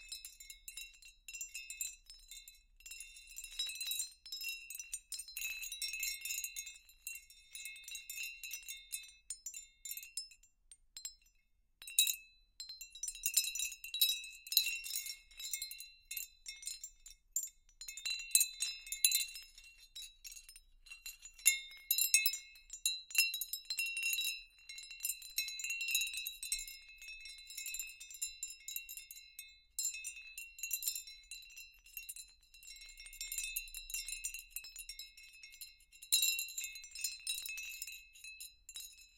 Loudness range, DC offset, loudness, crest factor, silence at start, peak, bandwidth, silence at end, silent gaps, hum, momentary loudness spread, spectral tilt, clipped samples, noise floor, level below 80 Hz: 11 LU; under 0.1%; -38 LUFS; 34 dB; 0 s; -8 dBFS; 17 kHz; 0.1 s; none; none; 20 LU; 5.5 dB/octave; under 0.1%; -74 dBFS; -68 dBFS